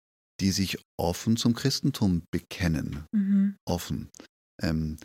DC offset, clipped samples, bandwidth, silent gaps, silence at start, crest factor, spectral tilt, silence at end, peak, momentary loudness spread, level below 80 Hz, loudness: under 0.1%; under 0.1%; 16.5 kHz; 0.85-0.98 s, 2.28-2.33 s, 3.60-3.67 s, 4.29-4.59 s; 0.4 s; 18 dB; -5.5 dB/octave; 0 s; -10 dBFS; 8 LU; -46 dBFS; -28 LUFS